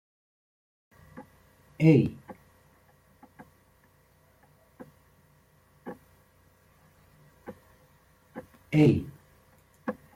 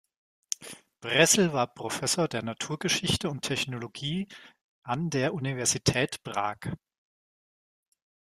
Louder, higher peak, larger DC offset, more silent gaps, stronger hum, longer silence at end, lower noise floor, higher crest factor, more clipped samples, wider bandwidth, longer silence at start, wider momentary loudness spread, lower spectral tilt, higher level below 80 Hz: first, -25 LUFS vs -28 LUFS; about the same, -8 dBFS vs -6 dBFS; neither; second, none vs 4.61-4.82 s; neither; second, 0.25 s vs 1.6 s; second, -63 dBFS vs under -90 dBFS; about the same, 24 dB vs 24 dB; neither; second, 14 kHz vs 15.5 kHz; first, 1.15 s vs 0.6 s; first, 30 LU vs 15 LU; first, -9 dB/octave vs -3 dB/octave; about the same, -62 dBFS vs -60 dBFS